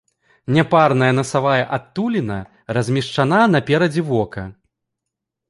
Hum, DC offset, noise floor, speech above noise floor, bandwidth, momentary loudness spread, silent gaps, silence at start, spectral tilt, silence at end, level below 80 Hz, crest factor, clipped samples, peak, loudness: none; under 0.1%; -81 dBFS; 64 dB; 11.5 kHz; 13 LU; none; 0.5 s; -6.5 dB/octave; 0.95 s; -52 dBFS; 16 dB; under 0.1%; -2 dBFS; -18 LUFS